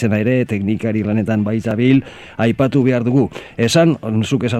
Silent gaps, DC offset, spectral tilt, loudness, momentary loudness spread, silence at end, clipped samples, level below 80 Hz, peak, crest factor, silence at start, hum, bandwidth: none; under 0.1%; -6.5 dB/octave; -16 LUFS; 5 LU; 0 s; under 0.1%; -48 dBFS; 0 dBFS; 14 dB; 0 s; none; 13.5 kHz